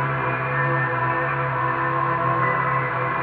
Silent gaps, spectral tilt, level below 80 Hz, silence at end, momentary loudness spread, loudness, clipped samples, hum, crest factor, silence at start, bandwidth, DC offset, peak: none; -11 dB/octave; -50 dBFS; 0 s; 2 LU; -22 LUFS; under 0.1%; none; 14 dB; 0 s; 4.7 kHz; under 0.1%; -8 dBFS